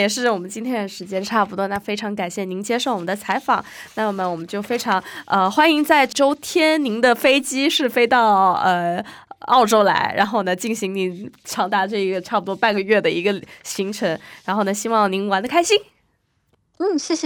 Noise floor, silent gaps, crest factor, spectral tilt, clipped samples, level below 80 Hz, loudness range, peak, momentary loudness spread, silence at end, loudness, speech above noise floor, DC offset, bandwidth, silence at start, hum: -66 dBFS; none; 18 dB; -3.5 dB/octave; under 0.1%; -62 dBFS; 6 LU; 0 dBFS; 10 LU; 0 s; -19 LUFS; 47 dB; under 0.1%; over 20 kHz; 0 s; none